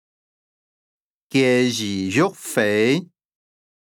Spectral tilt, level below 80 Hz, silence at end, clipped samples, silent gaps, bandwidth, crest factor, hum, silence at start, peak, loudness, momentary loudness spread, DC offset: -4.5 dB/octave; -76 dBFS; 0.75 s; under 0.1%; none; 20 kHz; 18 dB; none; 1.35 s; -4 dBFS; -20 LUFS; 6 LU; under 0.1%